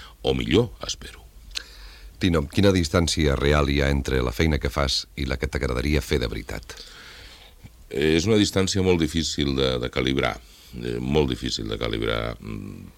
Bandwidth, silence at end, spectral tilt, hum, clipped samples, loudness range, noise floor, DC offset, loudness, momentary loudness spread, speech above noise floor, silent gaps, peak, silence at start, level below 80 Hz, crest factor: 16.5 kHz; 0.05 s; -5 dB/octave; none; under 0.1%; 4 LU; -47 dBFS; under 0.1%; -23 LUFS; 16 LU; 23 dB; none; -4 dBFS; 0 s; -34 dBFS; 20 dB